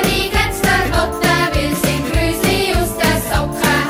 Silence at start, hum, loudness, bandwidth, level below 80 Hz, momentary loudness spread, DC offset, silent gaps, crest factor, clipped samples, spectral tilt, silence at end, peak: 0 s; none; -16 LUFS; 16.5 kHz; -26 dBFS; 3 LU; under 0.1%; none; 16 dB; under 0.1%; -4 dB/octave; 0 s; 0 dBFS